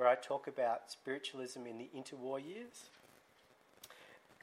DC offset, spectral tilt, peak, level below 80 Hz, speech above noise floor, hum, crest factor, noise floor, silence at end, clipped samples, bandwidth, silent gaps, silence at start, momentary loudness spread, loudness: under 0.1%; -3.5 dB/octave; -18 dBFS; under -90 dBFS; 26 dB; none; 24 dB; -69 dBFS; 0.25 s; under 0.1%; 15.5 kHz; none; 0 s; 21 LU; -42 LUFS